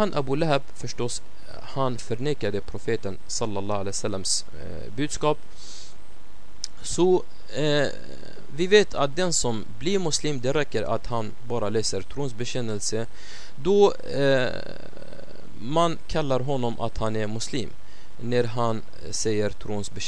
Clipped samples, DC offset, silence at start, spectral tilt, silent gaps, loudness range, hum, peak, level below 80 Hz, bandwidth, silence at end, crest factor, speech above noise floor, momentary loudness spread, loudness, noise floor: under 0.1%; 6%; 0 s; -4.5 dB/octave; none; 5 LU; none; -4 dBFS; -46 dBFS; 11 kHz; 0 s; 22 dB; 24 dB; 18 LU; -26 LUFS; -50 dBFS